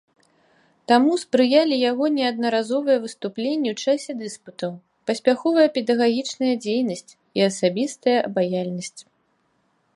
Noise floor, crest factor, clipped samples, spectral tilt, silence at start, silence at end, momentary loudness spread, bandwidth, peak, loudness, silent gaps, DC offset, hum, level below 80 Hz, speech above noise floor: -67 dBFS; 20 dB; under 0.1%; -4.5 dB/octave; 0.9 s; 0.95 s; 14 LU; 11.5 kHz; -2 dBFS; -22 LUFS; none; under 0.1%; none; -74 dBFS; 46 dB